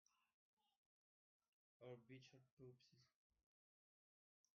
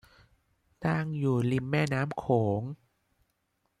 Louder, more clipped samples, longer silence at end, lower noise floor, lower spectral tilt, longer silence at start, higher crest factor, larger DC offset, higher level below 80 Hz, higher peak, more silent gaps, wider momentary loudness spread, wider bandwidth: second, -65 LUFS vs -29 LUFS; neither; first, 1.45 s vs 1.05 s; first, under -90 dBFS vs -77 dBFS; second, -5.5 dB/octave vs -7.5 dB/octave; second, 0.1 s vs 0.8 s; about the same, 22 dB vs 18 dB; neither; second, under -90 dBFS vs -62 dBFS; second, -48 dBFS vs -12 dBFS; first, 0.34-0.57 s, 0.77-1.40 s, 1.48-1.80 s, 2.51-2.57 s vs none; about the same, 5 LU vs 7 LU; second, 6.4 kHz vs 12.5 kHz